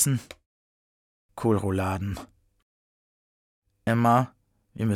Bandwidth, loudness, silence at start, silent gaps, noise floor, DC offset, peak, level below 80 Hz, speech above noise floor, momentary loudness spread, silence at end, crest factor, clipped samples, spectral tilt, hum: 17 kHz; -26 LUFS; 0 s; 0.46-1.29 s, 2.63-3.62 s; under -90 dBFS; under 0.1%; -10 dBFS; -58 dBFS; over 65 dB; 13 LU; 0 s; 18 dB; under 0.1%; -5.5 dB/octave; none